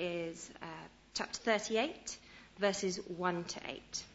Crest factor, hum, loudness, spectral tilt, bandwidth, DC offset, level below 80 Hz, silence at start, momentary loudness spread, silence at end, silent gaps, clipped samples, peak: 22 dB; none; -38 LUFS; -3.5 dB/octave; 8.2 kHz; under 0.1%; -68 dBFS; 0 s; 14 LU; 0 s; none; under 0.1%; -18 dBFS